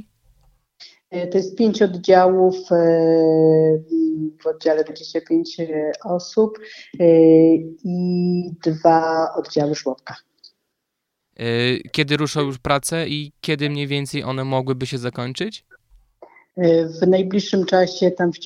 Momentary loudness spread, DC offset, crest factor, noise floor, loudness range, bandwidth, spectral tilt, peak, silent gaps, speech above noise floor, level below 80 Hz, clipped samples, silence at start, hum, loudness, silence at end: 12 LU; under 0.1%; 18 dB; -78 dBFS; 7 LU; 13 kHz; -6 dB/octave; 0 dBFS; none; 60 dB; -58 dBFS; under 0.1%; 0.8 s; none; -19 LUFS; 0 s